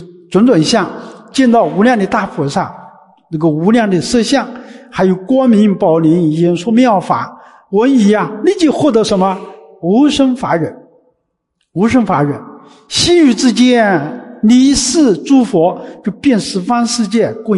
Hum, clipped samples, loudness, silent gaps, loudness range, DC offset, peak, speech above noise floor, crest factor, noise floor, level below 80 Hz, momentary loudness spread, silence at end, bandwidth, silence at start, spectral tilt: none; under 0.1%; -12 LUFS; none; 4 LU; under 0.1%; 0 dBFS; 56 dB; 12 dB; -67 dBFS; -44 dBFS; 11 LU; 0 s; 11.5 kHz; 0 s; -5 dB/octave